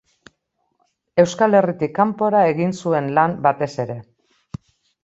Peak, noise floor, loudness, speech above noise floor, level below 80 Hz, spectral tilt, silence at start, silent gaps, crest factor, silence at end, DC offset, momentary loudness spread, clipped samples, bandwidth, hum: -2 dBFS; -70 dBFS; -18 LUFS; 53 dB; -58 dBFS; -6.5 dB/octave; 1.15 s; none; 18 dB; 1 s; under 0.1%; 20 LU; under 0.1%; 8 kHz; none